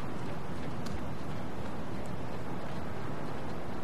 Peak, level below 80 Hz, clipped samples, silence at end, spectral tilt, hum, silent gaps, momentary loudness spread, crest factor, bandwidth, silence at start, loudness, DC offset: -22 dBFS; -52 dBFS; under 0.1%; 0 s; -6.5 dB/octave; none; none; 1 LU; 14 dB; 13.5 kHz; 0 s; -40 LUFS; 3%